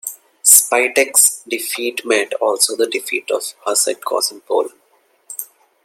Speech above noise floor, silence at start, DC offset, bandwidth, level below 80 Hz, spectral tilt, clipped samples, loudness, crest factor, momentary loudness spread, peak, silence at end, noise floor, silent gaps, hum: 40 dB; 0.05 s; under 0.1%; 17 kHz; -74 dBFS; 1 dB/octave; under 0.1%; -15 LUFS; 18 dB; 20 LU; 0 dBFS; 0.4 s; -57 dBFS; none; none